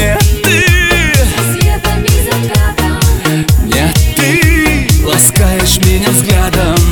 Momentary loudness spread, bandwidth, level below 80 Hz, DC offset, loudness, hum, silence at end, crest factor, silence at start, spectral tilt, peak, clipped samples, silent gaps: 4 LU; over 20 kHz; -14 dBFS; under 0.1%; -9 LUFS; none; 0 s; 8 dB; 0 s; -4 dB/octave; 0 dBFS; under 0.1%; none